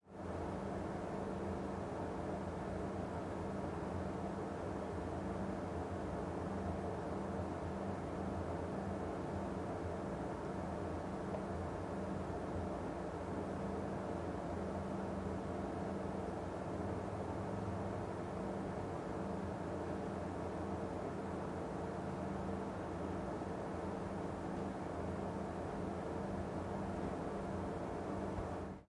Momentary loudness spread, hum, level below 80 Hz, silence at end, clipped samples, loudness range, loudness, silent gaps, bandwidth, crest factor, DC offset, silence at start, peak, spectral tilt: 1 LU; none; -58 dBFS; 0.05 s; under 0.1%; 1 LU; -43 LUFS; none; 11.5 kHz; 16 dB; under 0.1%; 0.05 s; -26 dBFS; -7.5 dB/octave